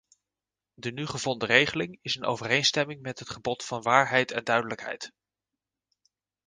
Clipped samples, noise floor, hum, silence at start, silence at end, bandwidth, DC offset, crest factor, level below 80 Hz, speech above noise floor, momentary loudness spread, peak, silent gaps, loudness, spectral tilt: under 0.1%; under -90 dBFS; none; 0.8 s; 1.4 s; 10 kHz; under 0.1%; 26 dB; -66 dBFS; over 62 dB; 15 LU; -4 dBFS; none; -26 LUFS; -3 dB/octave